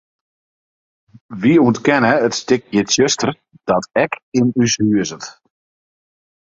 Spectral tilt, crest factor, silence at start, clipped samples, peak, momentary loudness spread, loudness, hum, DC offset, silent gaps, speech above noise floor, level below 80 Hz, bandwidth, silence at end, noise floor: -4.5 dB/octave; 18 dB; 1.3 s; under 0.1%; 0 dBFS; 12 LU; -16 LUFS; none; under 0.1%; 4.23-4.32 s; over 74 dB; -54 dBFS; 7.8 kHz; 1.3 s; under -90 dBFS